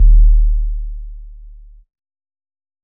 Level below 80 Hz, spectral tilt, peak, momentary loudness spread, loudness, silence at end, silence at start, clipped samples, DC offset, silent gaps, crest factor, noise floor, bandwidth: -14 dBFS; -25 dB/octave; -2 dBFS; 23 LU; -17 LUFS; 1.5 s; 0 s; under 0.1%; under 0.1%; none; 12 dB; -38 dBFS; 0.3 kHz